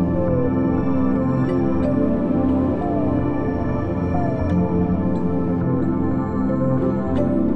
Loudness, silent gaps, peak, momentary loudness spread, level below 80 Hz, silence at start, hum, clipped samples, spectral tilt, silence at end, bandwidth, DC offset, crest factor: -20 LUFS; none; -8 dBFS; 2 LU; -38 dBFS; 0 s; none; under 0.1%; -11 dB/octave; 0 s; 5.8 kHz; under 0.1%; 12 dB